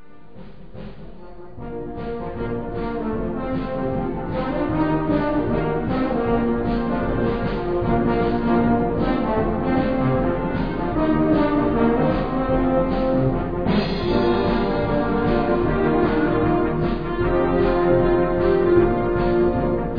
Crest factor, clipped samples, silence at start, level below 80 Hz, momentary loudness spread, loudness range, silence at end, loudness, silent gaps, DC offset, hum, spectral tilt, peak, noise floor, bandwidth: 16 dB; under 0.1%; 0.35 s; -32 dBFS; 9 LU; 7 LU; 0 s; -21 LUFS; none; 1%; none; -10 dB/octave; -4 dBFS; -43 dBFS; 5.2 kHz